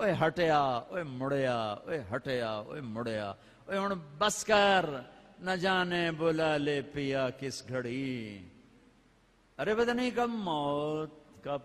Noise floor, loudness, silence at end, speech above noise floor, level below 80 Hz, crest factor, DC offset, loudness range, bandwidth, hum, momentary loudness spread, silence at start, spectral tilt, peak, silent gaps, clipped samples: -65 dBFS; -32 LUFS; 0 s; 34 dB; -64 dBFS; 20 dB; under 0.1%; 6 LU; 15 kHz; none; 13 LU; 0 s; -4.5 dB/octave; -12 dBFS; none; under 0.1%